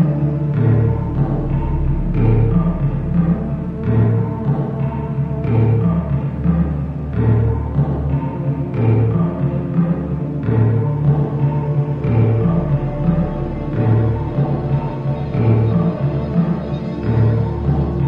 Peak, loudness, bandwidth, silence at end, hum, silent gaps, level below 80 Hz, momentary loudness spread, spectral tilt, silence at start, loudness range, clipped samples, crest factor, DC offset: -2 dBFS; -18 LUFS; 4.3 kHz; 0 s; none; none; -28 dBFS; 6 LU; -11.5 dB/octave; 0 s; 1 LU; under 0.1%; 14 dB; under 0.1%